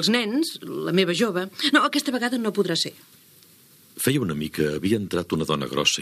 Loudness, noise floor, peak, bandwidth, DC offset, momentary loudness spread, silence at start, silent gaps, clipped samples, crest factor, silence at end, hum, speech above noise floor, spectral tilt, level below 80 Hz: -23 LUFS; -53 dBFS; -4 dBFS; 15.5 kHz; under 0.1%; 6 LU; 0 s; none; under 0.1%; 20 dB; 0 s; none; 30 dB; -4 dB/octave; -58 dBFS